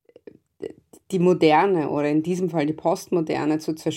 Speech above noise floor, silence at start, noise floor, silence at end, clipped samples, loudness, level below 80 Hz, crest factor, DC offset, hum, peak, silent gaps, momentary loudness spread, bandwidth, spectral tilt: 28 dB; 0.6 s; -49 dBFS; 0 s; under 0.1%; -22 LUFS; -66 dBFS; 18 dB; under 0.1%; none; -4 dBFS; none; 20 LU; 15.5 kHz; -6.5 dB/octave